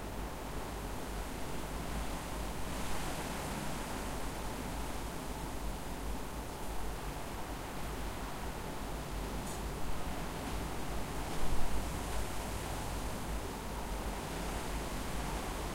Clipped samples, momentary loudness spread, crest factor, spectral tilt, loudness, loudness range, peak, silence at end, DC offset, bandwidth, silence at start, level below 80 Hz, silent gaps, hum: under 0.1%; 3 LU; 20 dB; -4.5 dB/octave; -41 LUFS; 2 LU; -18 dBFS; 0 s; under 0.1%; 16 kHz; 0 s; -42 dBFS; none; none